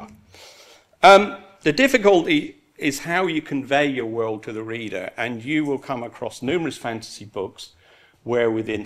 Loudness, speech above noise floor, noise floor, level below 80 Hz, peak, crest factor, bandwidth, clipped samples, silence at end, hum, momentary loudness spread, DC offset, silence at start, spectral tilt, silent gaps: -21 LUFS; 30 dB; -50 dBFS; -58 dBFS; 0 dBFS; 20 dB; 15 kHz; under 0.1%; 0 s; none; 17 LU; under 0.1%; 0 s; -4.5 dB/octave; none